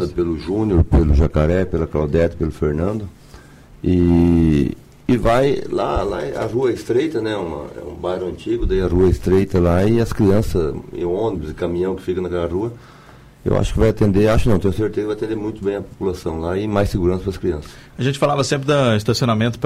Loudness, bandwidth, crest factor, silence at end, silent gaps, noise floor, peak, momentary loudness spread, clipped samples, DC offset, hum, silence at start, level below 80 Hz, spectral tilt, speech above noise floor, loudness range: -19 LUFS; 15 kHz; 14 dB; 0 s; none; -42 dBFS; -4 dBFS; 9 LU; under 0.1%; under 0.1%; none; 0 s; -28 dBFS; -7 dB/octave; 25 dB; 4 LU